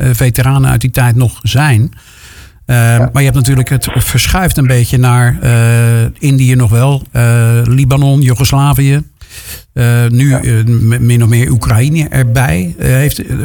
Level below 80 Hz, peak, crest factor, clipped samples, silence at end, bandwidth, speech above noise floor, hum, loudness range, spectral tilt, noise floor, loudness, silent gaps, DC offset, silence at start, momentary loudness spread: -26 dBFS; 0 dBFS; 8 dB; under 0.1%; 0 s; 19.5 kHz; 26 dB; none; 2 LU; -6 dB/octave; -35 dBFS; -9 LUFS; none; under 0.1%; 0 s; 4 LU